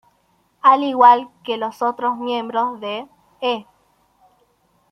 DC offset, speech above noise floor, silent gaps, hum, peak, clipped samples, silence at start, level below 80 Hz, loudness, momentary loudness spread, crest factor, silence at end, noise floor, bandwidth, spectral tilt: under 0.1%; 45 dB; none; none; -2 dBFS; under 0.1%; 0.65 s; -72 dBFS; -18 LUFS; 16 LU; 18 dB; 1.3 s; -62 dBFS; 9.4 kHz; -4.5 dB/octave